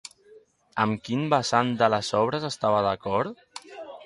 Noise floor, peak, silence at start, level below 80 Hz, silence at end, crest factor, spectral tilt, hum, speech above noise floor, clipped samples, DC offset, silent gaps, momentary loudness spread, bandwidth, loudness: -55 dBFS; -6 dBFS; 0.35 s; -60 dBFS; 0 s; 20 dB; -5 dB/octave; none; 31 dB; under 0.1%; under 0.1%; none; 19 LU; 11.5 kHz; -25 LUFS